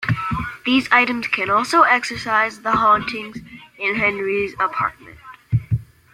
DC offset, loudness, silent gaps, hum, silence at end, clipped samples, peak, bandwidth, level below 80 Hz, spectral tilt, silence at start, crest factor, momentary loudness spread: under 0.1%; -18 LUFS; none; none; 0.3 s; under 0.1%; -2 dBFS; 15.5 kHz; -46 dBFS; -5.5 dB/octave; 0 s; 18 dB; 11 LU